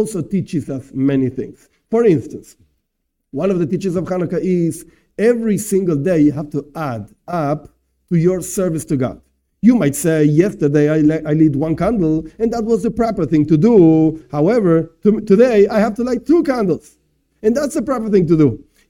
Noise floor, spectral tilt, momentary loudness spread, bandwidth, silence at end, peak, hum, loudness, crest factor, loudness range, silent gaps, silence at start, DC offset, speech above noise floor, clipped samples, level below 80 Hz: -72 dBFS; -7.5 dB/octave; 11 LU; 17 kHz; 0.3 s; 0 dBFS; none; -16 LUFS; 16 dB; 6 LU; none; 0 s; under 0.1%; 57 dB; under 0.1%; -44 dBFS